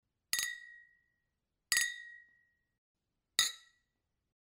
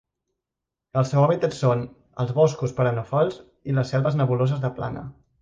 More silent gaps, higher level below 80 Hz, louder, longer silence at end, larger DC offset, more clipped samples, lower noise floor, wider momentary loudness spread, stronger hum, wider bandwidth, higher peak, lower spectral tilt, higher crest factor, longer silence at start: first, 2.78-2.95 s vs none; second, -78 dBFS vs -56 dBFS; second, -34 LUFS vs -23 LUFS; first, 0.9 s vs 0.3 s; neither; neither; about the same, -86 dBFS vs -86 dBFS; first, 21 LU vs 12 LU; neither; first, 16 kHz vs 7.6 kHz; second, -10 dBFS vs -6 dBFS; second, 3.5 dB/octave vs -7.5 dB/octave; first, 32 dB vs 16 dB; second, 0.35 s vs 0.95 s